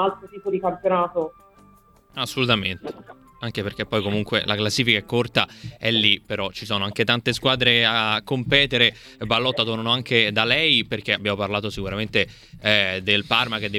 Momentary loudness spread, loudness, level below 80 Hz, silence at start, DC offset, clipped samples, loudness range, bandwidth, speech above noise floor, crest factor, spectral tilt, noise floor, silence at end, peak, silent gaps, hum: 11 LU; -21 LUFS; -50 dBFS; 0 s; under 0.1%; under 0.1%; 6 LU; 15.5 kHz; 31 dB; 22 dB; -4.5 dB/octave; -54 dBFS; 0 s; -2 dBFS; none; none